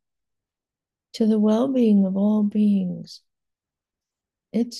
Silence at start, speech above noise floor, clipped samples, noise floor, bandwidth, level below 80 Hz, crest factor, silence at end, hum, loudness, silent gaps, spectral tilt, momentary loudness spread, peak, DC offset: 1.15 s; 69 dB; under 0.1%; -89 dBFS; 7.6 kHz; -72 dBFS; 14 dB; 0 s; none; -21 LUFS; none; -8 dB/octave; 12 LU; -10 dBFS; under 0.1%